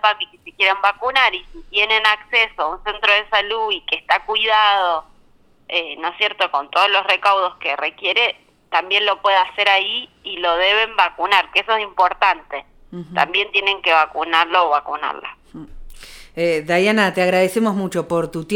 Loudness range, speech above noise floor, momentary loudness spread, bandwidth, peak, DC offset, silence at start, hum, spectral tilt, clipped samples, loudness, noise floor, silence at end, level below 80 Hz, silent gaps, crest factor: 3 LU; 34 dB; 10 LU; 18 kHz; -2 dBFS; under 0.1%; 0.05 s; none; -3.5 dB/octave; under 0.1%; -17 LUFS; -52 dBFS; 0 s; -48 dBFS; none; 18 dB